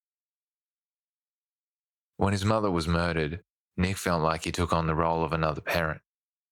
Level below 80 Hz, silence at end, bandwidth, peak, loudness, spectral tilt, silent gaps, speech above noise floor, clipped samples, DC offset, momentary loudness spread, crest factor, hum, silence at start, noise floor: -46 dBFS; 0.55 s; 17.5 kHz; -8 dBFS; -28 LUFS; -6 dB/octave; 3.52-3.68 s; over 63 dB; under 0.1%; under 0.1%; 7 LU; 22 dB; none; 2.2 s; under -90 dBFS